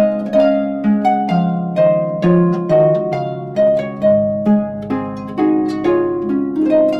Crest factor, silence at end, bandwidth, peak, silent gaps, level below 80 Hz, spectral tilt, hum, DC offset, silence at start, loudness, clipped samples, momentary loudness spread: 12 dB; 0 s; 7.6 kHz; -2 dBFS; none; -50 dBFS; -9.5 dB/octave; none; under 0.1%; 0 s; -16 LUFS; under 0.1%; 8 LU